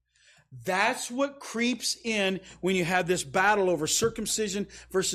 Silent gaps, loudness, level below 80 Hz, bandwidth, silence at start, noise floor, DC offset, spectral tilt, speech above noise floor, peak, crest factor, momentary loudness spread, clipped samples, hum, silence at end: none; -27 LUFS; -58 dBFS; 15.5 kHz; 0.5 s; -62 dBFS; under 0.1%; -3 dB/octave; 34 dB; -10 dBFS; 18 dB; 7 LU; under 0.1%; none; 0 s